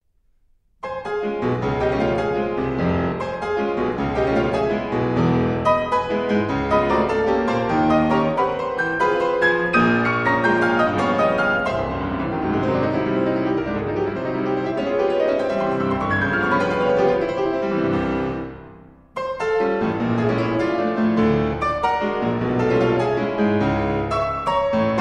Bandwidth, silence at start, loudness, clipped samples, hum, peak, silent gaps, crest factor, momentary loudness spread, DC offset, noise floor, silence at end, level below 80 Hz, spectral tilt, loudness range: 10 kHz; 0.85 s; -20 LUFS; under 0.1%; none; -4 dBFS; none; 16 dB; 6 LU; under 0.1%; -61 dBFS; 0 s; -42 dBFS; -7.5 dB/octave; 4 LU